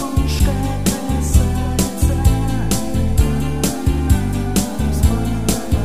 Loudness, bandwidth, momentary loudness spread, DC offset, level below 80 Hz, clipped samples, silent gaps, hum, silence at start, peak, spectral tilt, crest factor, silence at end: -18 LUFS; 16 kHz; 3 LU; 3%; -20 dBFS; under 0.1%; none; none; 0 s; 0 dBFS; -5.5 dB/octave; 16 dB; 0 s